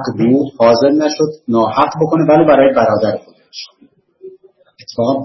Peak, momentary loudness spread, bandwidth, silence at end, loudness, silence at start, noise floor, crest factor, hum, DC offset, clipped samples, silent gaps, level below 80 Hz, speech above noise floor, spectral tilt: 0 dBFS; 21 LU; 6.2 kHz; 0 s; -12 LUFS; 0 s; -45 dBFS; 14 dB; none; under 0.1%; under 0.1%; none; -52 dBFS; 33 dB; -6.5 dB/octave